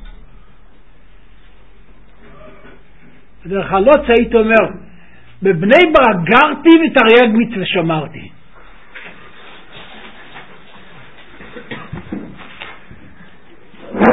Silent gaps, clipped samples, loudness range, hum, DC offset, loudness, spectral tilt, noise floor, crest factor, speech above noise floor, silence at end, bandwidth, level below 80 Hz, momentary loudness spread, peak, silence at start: none; under 0.1%; 22 LU; none; 2%; -11 LUFS; -7.5 dB/octave; -47 dBFS; 16 dB; 36 dB; 0 s; 8 kHz; -42 dBFS; 27 LU; 0 dBFS; 0 s